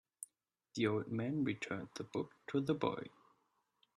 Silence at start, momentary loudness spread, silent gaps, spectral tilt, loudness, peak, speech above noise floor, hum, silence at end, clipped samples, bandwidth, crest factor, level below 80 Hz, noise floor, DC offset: 0.2 s; 16 LU; none; -6 dB/octave; -40 LUFS; -20 dBFS; 41 dB; none; 0.9 s; under 0.1%; 12.5 kHz; 20 dB; -78 dBFS; -80 dBFS; under 0.1%